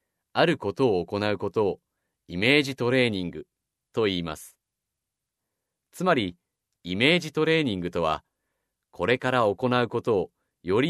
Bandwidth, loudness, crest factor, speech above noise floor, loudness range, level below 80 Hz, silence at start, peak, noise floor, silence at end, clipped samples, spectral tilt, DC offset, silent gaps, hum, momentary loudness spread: 13.5 kHz; -25 LUFS; 22 dB; 61 dB; 6 LU; -60 dBFS; 0.35 s; -6 dBFS; -85 dBFS; 0 s; under 0.1%; -5.5 dB/octave; under 0.1%; none; none; 15 LU